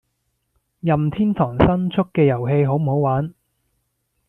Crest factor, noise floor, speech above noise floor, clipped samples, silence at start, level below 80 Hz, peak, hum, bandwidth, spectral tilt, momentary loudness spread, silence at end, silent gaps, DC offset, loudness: 18 dB; -72 dBFS; 54 dB; under 0.1%; 0.85 s; -42 dBFS; -2 dBFS; none; 3.9 kHz; -10.5 dB/octave; 5 LU; 1 s; none; under 0.1%; -19 LUFS